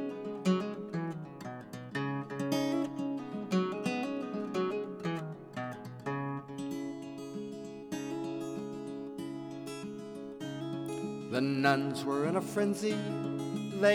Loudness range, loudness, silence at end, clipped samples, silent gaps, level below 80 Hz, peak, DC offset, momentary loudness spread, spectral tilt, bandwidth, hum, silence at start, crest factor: 8 LU; -36 LUFS; 0 s; under 0.1%; none; -76 dBFS; -12 dBFS; under 0.1%; 11 LU; -6 dB/octave; 17 kHz; none; 0 s; 24 dB